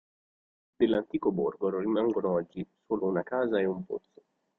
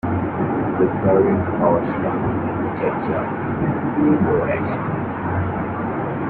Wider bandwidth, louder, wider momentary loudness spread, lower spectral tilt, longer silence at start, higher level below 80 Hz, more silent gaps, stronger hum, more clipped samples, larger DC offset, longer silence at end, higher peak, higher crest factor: about the same, 4.1 kHz vs 4.3 kHz; second, -30 LUFS vs -20 LUFS; first, 11 LU vs 7 LU; second, -9.5 dB/octave vs -12 dB/octave; first, 0.8 s vs 0.05 s; second, -66 dBFS vs -44 dBFS; neither; neither; neither; neither; first, 0.6 s vs 0 s; second, -12 dBFS vs -4 dBFS; about the same, 18 dB vs 16 dB